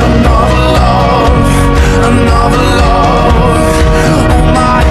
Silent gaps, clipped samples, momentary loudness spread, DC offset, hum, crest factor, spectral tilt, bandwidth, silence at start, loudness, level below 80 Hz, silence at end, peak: none; 0.7%; 1 LU; under 0.1%; none; 6 dB; -6 dB/octave; 14 kHz; 0 s; -8 LUFS; -12 dBFS; 0 s; 0 dBFS